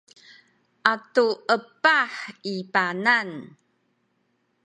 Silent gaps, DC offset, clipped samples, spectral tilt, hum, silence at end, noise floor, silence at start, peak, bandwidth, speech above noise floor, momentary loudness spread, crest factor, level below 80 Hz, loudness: none; under 0.1%; under 0.1%; -4 dB/octave; none; 1.15 s; -71 dBFS; 0.85 s; 0 dBFS; 10 kHz; 47 dB; 13 LU; 26 dB; -80 dBFS; -23 LUFS